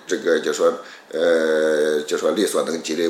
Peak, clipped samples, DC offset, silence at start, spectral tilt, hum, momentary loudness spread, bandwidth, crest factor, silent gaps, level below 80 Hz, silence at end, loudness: -4 dBFS; under 0.1%; under 0.1%; 0.05 s; -3 dB/octave; none; 5 LU; 15.5 kHz; 16 dB; none; -78 dBFS; 0 s; -20 LUFS